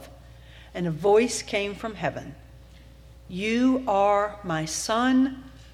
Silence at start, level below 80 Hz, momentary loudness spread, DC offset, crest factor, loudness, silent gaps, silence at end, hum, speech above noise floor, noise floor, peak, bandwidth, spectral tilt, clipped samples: 0 s; -50 dBFS; 16 LU; under 0.1%; 16 dB; -25 LUFS; none; 0.05 s; none; 24 dB; -48 dBFS; -10 dBFS; 14 kHz; -4.5 dB/octave; under 0.1%